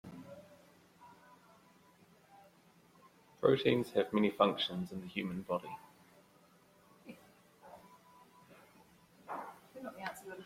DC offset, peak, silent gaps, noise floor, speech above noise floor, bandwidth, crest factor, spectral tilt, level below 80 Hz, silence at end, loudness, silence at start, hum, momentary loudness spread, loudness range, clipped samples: under 0.1%; -14 dBFS; none; -66 dBFS; 32 dB; 16.5 kHz; 26 dB; -6 dB/octave; -76 dBFS; 0 s; -35 LUFS; 0.05 s; none; 27 LU; 19 LU; under 0.1%